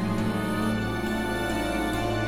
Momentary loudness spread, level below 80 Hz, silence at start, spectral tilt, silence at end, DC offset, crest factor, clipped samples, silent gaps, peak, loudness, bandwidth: 1 LU; -40 dBFS; 0 s; -5.5 dB/octave; 0 s; under 0.1%; 12 dB; under 0.1%; none; -14 dBFS; -27 LUFS; 16.5 kHz